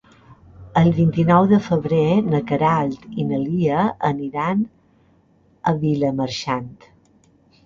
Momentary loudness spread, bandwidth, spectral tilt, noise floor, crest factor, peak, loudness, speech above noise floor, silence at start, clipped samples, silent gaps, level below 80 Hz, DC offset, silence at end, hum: 10 LU; 7.4 kHz; -8 dB/octave; -57 dBFS; 18 dB; -4 dBFS; -20 LUFS; 38 dB; 0.3 s; under 0.1%; none; -50 dBFS; under 0.1%; 0.95 s; none